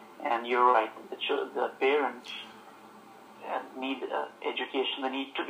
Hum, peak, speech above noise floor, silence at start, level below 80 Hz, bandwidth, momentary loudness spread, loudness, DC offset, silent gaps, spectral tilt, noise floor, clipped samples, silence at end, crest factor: none; -10 dBFS; 22 dB; 0 s; -88 dBFS; 15.5 kHz; 16 LU; -30 LUFS; under 0.1%; none; -3.5 dB/octave; -52 dBFS; under 0.1%; 0 s; 22 dB